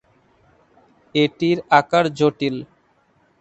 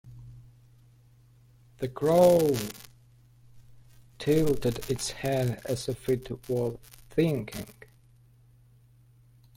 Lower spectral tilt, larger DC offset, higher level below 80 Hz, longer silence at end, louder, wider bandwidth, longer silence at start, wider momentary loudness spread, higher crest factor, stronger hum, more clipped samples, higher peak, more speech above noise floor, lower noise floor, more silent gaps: about the same, -6 dB/octave vs -6 dB/octave; neither; second, -62 dBFS vs -54 dBFS; second, 0.75 s vs 1.85 s; first, -19 LUFS vs -28 LUFS; second, 8.2 kHz vs 16.5 kHz; first, 1.15 s vs 0.05 s; second, 9 LU vs 20 LU; about the same, 22 dB vs 20 dB; second, none vs 50 Hz at -65 dBFS; neither; first, 0 dBFS vs -10 dBFS; first, 42 dB vs 32 dB; about the same, -60 dBFS vs -58 dBFS; neither